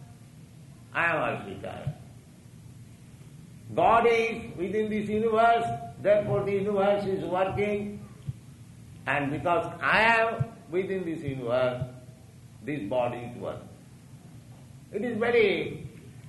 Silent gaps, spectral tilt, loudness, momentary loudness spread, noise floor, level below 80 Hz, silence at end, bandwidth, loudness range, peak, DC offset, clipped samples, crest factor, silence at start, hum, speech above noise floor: none; -6.5 dB/octave; -27 LUFS; 18 LU; -49 dBFS; -58 dBFS; 0 s; 12 kHz; 8 LU; -10 dBFS; under 0.1%; under 0.1%; 18 dB; 0 s; none; 23 dB